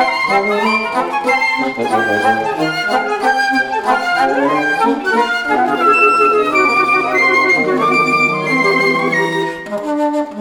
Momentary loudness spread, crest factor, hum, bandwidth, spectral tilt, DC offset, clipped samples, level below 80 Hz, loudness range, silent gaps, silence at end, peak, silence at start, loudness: 6 LU; 14 dB; none; 18 kHz; -4.5 dB/octave; under 0.1%; under 0.1%; -54 dBFS; 3 LU; none; 0 s; 0 dBFS; 0 s; -13 LUFS